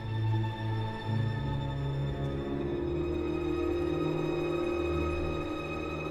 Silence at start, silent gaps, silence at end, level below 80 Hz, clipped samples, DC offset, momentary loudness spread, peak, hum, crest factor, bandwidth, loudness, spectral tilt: 0 s; none; 0 s; -42 dBFS; under 0.1%; under 0.1%; 3 LU; -20 dBFS; none; 12 dB; 10.5 kHz; -33 LUFS; -8 dB/octave